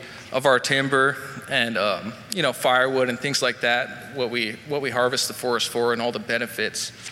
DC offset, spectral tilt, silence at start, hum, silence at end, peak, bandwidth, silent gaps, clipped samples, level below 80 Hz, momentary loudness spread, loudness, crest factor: under 0.1%; -3 dB/octave; 0 s; none; 0 s; -6 dBFS; 16.5 kHz; none; under 0.1%; -66 dBFS; 8 LU; -23 LUFS; 18 dB